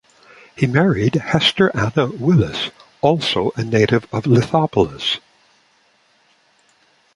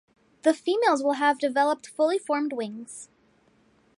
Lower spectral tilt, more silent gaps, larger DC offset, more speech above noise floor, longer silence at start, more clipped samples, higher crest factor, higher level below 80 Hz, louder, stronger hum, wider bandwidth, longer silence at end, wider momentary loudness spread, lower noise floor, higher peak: first, -6 dB/octave vs -3 dB/octave; neither; neither; about the same, 41 dB vs 38 dB; first, 0.6 s vs 0.45 s; neither; about the same, 18 dB vs 20 dB; first, -46 dBFS vs -80 dBFS; first, -17 LUFS vs -25 LUFS; neither; about the same, 11.5 kHz vs 11.5 kHz; first, 2 s vs 0.95 s; second, 6 LU vs 13 LU; second, -58 dBFS vs -63 dBFS; first, -2 dBFS vs -8 dBFS